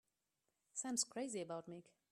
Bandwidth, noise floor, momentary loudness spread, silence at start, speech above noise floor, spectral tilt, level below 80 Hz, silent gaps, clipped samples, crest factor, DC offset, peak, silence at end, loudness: 14 kHz; -89 dBFS; 14 LU; 0.75 s; 43 dB; -2.5 dB/octave; under -90 dBFS; none; under 0.1%; 24 dB; under 0.1%; -22 dBFS; 0.3 s; -44 LUFS